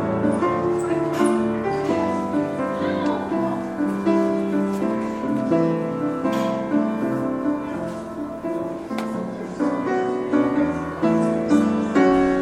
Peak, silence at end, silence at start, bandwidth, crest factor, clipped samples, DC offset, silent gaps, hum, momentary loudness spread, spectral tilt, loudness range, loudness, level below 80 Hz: -6 dBFS; 0 s; 0 s; 13 kHz; 16 dB; under 0.1%; under 0.1%; none; none; 9 LU; -7 dB/octave; 3 LU; -22 LUFS; -52 dBFS